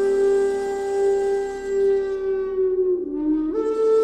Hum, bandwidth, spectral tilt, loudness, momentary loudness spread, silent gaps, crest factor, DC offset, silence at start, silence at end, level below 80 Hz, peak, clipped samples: none; 9.6 kHz; -5.5 dB/octave; -22 LUFS; 5 LU; none; 10 dB; under 0.1%; 0 s; 0 s; -50 dBFS; -10 dBFS; under 0.1%